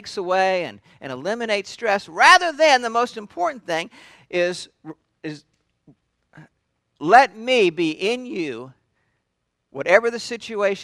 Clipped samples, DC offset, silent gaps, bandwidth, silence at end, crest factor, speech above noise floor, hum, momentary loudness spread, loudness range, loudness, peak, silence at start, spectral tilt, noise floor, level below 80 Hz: under 0.1%; under 0.1%; none; 14 kHz; 0 s; 22 dB; 55 dB; none; 21 LU; 10 LU; -19 LUFS; 0 dBFS; 0.05 s; -3 dB/octave; -76 dBFS; -66 dBFS